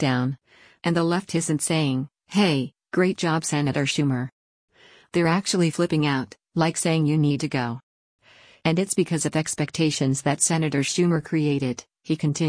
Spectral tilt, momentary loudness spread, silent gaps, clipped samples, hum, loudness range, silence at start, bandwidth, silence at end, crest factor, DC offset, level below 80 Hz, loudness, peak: -5 dB/octave; 8 LU; 4.32-4.68 s, 7.83-8.19 s; under 0.1%; none; 2 LU; 0 s; 10.5 kHz; 0 s; 16 dB; under 0.1%; -60 dBFS; -23 LUFS; -8 dBFS